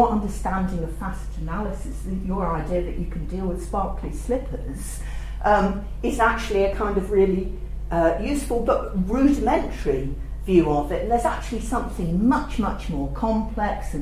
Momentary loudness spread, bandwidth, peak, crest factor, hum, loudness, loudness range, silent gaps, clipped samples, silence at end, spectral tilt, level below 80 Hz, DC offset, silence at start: 12 LU; 15.5 kHz; -4 dBFS; 18 dB; none; -24 LUFS; 6 LU; none; under 0.1%; 0 s; -6.5 dB/octave; -30 dBFS; under 0.1%; 0 s